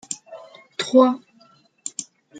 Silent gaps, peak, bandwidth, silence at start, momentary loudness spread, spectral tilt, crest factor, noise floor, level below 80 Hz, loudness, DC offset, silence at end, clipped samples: none; -2 dBFS; 9.4 kHz; 0.1 s; 21 LU; -3 dB/octave; 20 dB; -56 dBFS; -80 dBFS; -21 LUFS; under 0.1%; 0 s; under 0.1%